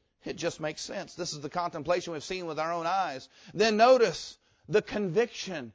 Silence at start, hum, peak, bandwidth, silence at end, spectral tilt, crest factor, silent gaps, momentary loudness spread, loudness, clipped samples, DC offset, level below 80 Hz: 0.25 s; none; -10 dBFS; 8 kHz; 0.05 s; -4 dB/octave; 20 dB; none; 15 LU; -29 LUFS; under 0.1%; under 0.1%; -64 dBFS